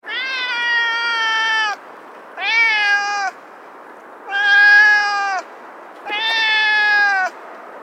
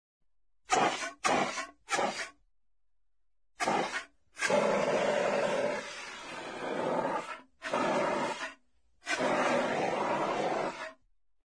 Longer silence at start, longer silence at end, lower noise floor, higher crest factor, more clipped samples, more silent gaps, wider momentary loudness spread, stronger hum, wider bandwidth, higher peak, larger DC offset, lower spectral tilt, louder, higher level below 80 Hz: second, 0.05 s vs 0.7 s; second, 0 s vs 0.5 s; second, -39 dBFS vs -84 dBFS; about the same, 16 dB vs 20 dB; neither; neither; first, 16 LU vs 13 LU; neither; second, 9.4 kHz vs 11 kHz; first, -2 dBFS vs -14 dBFS; neither; second, 2 dB/octave vs -3 dB/octave; first, -15 LUFS vs -32 LUFS; second, under -90 dBFS vs -70 dBFS